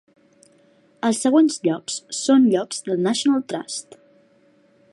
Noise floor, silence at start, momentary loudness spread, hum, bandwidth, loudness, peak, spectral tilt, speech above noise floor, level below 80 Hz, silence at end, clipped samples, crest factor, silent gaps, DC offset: -57 dBFS; 1.05 s; 12 LU; none; 11.5 kHz; -20 LUFS; -6 dBFS; -4 dB/octave; 38 dB; -74 dBFS; 1.1 s; under 0.1%; 16 dB; none; under 0.1%